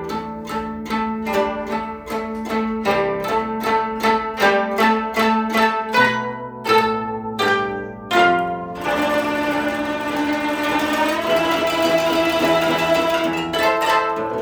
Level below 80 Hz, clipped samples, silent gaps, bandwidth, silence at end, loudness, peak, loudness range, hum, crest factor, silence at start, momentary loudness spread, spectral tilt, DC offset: -48 dBFS; under 0.1%; none; over 20 kHz; 0 s; -19 LUFS; -4 dBFS; 4 LU; none; 16 dB; 0 s; 9 LU; -4 dB/octave; under 0.1%